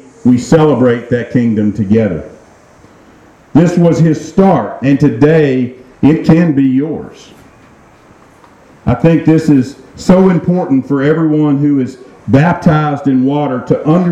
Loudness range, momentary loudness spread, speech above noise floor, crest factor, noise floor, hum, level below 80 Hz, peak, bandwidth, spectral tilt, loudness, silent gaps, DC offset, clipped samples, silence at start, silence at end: 4 LU; 8 LU; 32 dB; 10 dB; -42 dBFS; none; -40 dBFS; 0 dBFS; 9.2 kHz; -8.5 dB/octave; -11 LUFS; none; under 0.1%; 0.3%; 0.25 s; 0 s